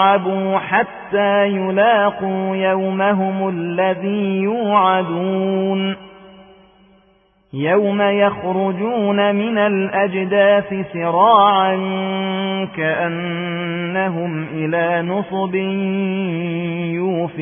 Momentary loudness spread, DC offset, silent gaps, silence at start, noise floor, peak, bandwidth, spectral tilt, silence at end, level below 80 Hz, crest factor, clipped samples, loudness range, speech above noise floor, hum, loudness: 8 LU; under 0.1%; none; 0 s; -56 dBFS; -2 dBFS; 3.6 kHz; -11.5 dB/octave; 0 s; -60 dBFS; 16 dB; under 0.1%; 5 LU; 39 dB; none; -18 LUFS